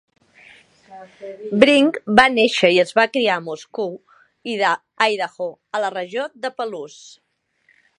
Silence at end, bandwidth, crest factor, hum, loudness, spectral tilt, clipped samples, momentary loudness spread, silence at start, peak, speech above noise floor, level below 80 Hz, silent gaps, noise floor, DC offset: 1.1 s; 11.5 kHz; 20 dB; none; -18 LUFS; -4 dB/octave; under 0.1%; 20 LU; 0.9 s; 0 dBFS; 43 dB; -60 dBFS; none; -62 dBFS; under 0.1%